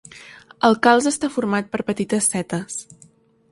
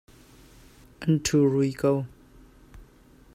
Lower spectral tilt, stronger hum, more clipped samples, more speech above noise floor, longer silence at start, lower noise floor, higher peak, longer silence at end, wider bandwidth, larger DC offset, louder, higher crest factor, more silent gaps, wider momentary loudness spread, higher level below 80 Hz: second, -4 dB/octave vs -6 dB/octave; neither; neither; about the same, 34 dB vs 31 dB; second, 0.15 s vs 1 s; about the same, -53 dBFS vs -54 dBFS; first, 0 dBFS vs -10 dBFS; first, 0.7 s vs 0.5 s; second, 11.5 kHz vs 15.5 kHz; neither; first, -20 LUFS vs -24 LUFS; about the same, 20 dB vs 18 dB; neither; first, 16 LU vs 10 LU; second, -60 dBFS vs -54 dBFS